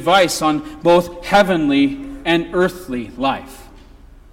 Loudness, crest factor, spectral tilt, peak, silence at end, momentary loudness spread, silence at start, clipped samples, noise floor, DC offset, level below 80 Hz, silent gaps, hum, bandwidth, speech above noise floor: -17 LUFS; 14 dB; -4.5 dB/octave; -2 dBFS; 0.55 s; 10 LU; 0 s; under 0.1%; -42 dBFS; under 0.1%; -42 dBFS; none; none; 17 kHz; 26 dB